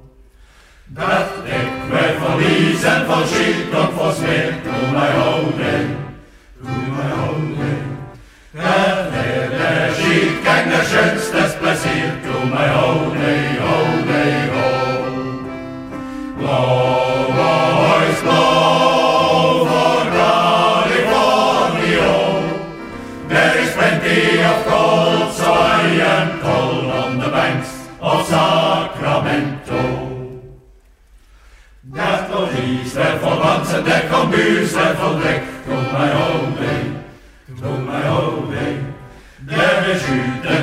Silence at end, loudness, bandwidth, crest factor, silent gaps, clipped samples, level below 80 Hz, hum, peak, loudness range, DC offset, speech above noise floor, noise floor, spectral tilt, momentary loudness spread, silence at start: 0 s; -16 LUFS; 16 kHz; 16 dB; none; under 0.1%; -44 dBFS; none; -2 dBFS; 7 LU; under 0.1%; 32 dB; -48 dBFS; -5 dB/octave; 11 LU; 0.05 s